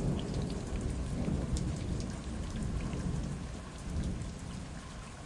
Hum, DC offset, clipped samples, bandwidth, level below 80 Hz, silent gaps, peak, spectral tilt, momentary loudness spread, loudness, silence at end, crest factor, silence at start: none; under 0.1%; under 0.1%; 11.5 kHz; -42 dBFS; none; -20 dBFS; -6.5 dB/octave; 9 LU; -38 LUFS; 0 s; 16 dB; 0 s